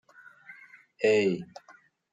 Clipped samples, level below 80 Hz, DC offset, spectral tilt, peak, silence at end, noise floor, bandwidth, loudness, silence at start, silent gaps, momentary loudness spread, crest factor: under 0.1%; -78 dBFS; under 0.1%; -5.5 dB/octave; -12 dBFS; 0.7 s; -54 dBFS; 9 kHz; -27 LUFS; 0.5 s; none; 25 LU; 18 dB